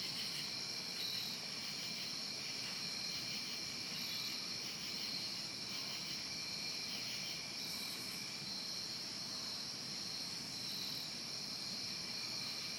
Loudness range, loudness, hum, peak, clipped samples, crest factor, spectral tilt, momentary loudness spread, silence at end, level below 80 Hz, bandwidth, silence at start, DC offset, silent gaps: 1 LU; -41 LUFS; none; -30 dBFS; under 0.1%; 14 dB; -1 dB/octave; 2 LU; 0 s; -76 dBFS; 19 kHz; 0 s; under 0.1%; none